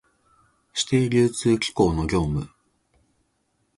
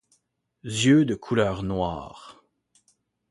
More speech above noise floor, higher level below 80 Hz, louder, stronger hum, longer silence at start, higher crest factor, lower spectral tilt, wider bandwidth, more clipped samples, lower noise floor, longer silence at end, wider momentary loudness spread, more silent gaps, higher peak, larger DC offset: about the same, 49 dB vs 48 dB; first, -42 dBFS vs -50 dBFS; about the same, -23 LUFS vs -23 LUFS; neither; about the same, 0.75 s vs 0.65 s; about the same, 18 dB vs 20 dB; about the same, -5.5 dB/octave vs -5.5 dB/octave; about the same, 11.5 kHz vs 11.5 kHz; neither; about the same, -70 dBFS vs -71 dBFS; first, 1.3 s vs 1 s; second, 10 LU vs 20 LU; neither; about the same, -6 dBFS vs -8 dBFS; neither